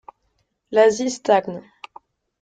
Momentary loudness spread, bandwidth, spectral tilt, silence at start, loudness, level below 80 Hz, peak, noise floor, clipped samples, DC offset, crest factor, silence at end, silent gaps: 16 LU; 9.2 kHz; -4 dB/octave; 0.7 s; -19 LUFS; -66 dBFS; -4 dBFS; -70 dBFS; under 0.1%; under 0.1%; 18 dB; 0.8 s; none